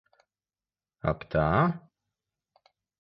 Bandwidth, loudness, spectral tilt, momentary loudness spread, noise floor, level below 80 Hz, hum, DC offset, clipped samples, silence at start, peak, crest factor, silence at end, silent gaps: 5.6 kHz; -28 LUFS; -10.5 dB/octave; 10 LU; under -90 dBFS; -48 dBFS; none; under 0.1%; under 0.1%; 1.05 s; -10 dBFS; 22 dB; 1.25 s; none